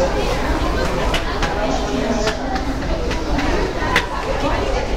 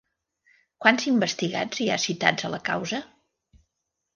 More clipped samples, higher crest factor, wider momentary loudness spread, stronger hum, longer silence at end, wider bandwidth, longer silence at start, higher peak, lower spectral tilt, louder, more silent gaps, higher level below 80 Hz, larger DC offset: neither; second, 16 dB vs 24 dB; second, 4 LU vs 8 LU; neither; second, 0 s vs 1.1 s; first, 16 kHz vs 10 kHz; second, 0 s vs 0.8 s; about the same, -2 dBFS vs -2 dBFS; first, -5 dB/octave vs -3.5 dB/octave; first, -20 LUFS vs -24 LUFS; neither; first, -24 dBFS vs -68 dBFS; first, 2% vs under 0.1%